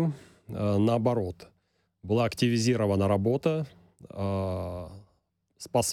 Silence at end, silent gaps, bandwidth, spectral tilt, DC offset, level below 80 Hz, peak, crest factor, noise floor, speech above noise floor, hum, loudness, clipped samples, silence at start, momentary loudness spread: 0 s; none; 16.5 kHz; -6 dB/octave; under 0.1%; -58 dBFS; -12 dBFS; 16 dB; -72 dBFS; 45 dB; none; -28 LUFS; under 0.1%; 0 s; 19 LU